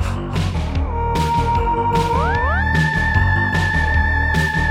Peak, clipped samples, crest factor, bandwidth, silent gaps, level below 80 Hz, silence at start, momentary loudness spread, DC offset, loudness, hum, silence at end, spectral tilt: -2 dBFS; under 0.1%; 14 dB; 14.5 kHz; none; -24 dBFS; 0 s; 5 LU; under 0.1%; -18 LUFS; none; 0 s; -6 dB/octave